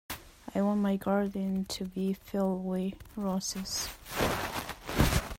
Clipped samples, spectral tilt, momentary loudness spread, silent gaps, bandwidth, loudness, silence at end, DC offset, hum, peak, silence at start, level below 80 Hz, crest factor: under 0.1%; -5 dB/octave; 8 LU; none; 16.5 kHz; -32 LUFS; 0 s; under 0.1%; none; -12 dBFS; 0.1 s; -44 dBFS; 20 dB